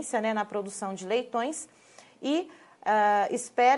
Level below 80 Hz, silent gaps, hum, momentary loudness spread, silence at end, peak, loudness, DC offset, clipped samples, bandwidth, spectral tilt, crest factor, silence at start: -82 dBFS; none; none; 13 LU; 0 s; -10 dBFS; -29 LUFS; under 0.1%; under 0.1%; 11.5 kHz; -3.5 dB/octave; 18 dB; 0 s